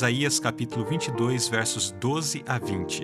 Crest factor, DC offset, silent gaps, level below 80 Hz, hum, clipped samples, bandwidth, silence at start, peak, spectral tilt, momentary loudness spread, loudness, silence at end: 18 dB; under 0.1%; none; -64 dBFS; none; under 0.1%; 14 kHz; 0 s; -8 dBFS; -3.5 dB/octave; 5 LU; -26 LUFS; 0 s